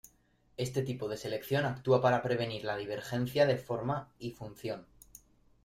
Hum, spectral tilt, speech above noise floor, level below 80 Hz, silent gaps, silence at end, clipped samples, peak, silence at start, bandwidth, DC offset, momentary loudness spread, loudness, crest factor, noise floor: none; -6 dB/octave; 36 dB; -64 dBFS; none; 0.8 s; under 0.1%; -14 dBFS; 0.6 s; 16 kHz; under 0.1%; 15 LU; -33 LUFS; 20 dB; -68 dBFS